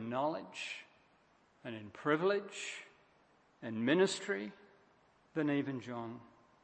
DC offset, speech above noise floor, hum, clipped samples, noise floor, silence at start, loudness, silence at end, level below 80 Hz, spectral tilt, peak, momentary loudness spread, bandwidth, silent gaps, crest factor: under 0.1%; 33 dB; none; under 0.1%; -70 dBFS; 0 s; -37 LUFS; 0.35 s; -84 dBFS; -5 dB/octave; -16 dBFS; 17 LU; 8.4 kHz; none; 22 dB